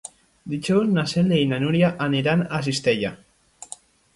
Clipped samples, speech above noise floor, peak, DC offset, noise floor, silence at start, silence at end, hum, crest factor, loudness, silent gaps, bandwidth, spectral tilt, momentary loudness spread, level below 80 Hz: under 0.1%; 24 dB; -6 dBFS; under 0.1%; -45 dBFS; 0.05 s; 0.5 s; none; 16 dB; -22 LUFS; none; 11.5 kHz; -6 dB/octave; 19 LU; -56 dBFS